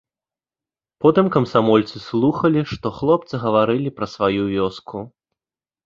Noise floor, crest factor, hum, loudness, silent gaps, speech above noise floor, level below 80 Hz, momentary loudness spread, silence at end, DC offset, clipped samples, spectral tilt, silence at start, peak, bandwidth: under -90 dBFS; 18 dB; none; -19 LUFS; none; over 72 dB; -52 dBFS; 10 LU; 0.75 s; under 0.1%; under 0.1%; -8 dB/octave; 1 s; -2 dBFS; 7.4 kHz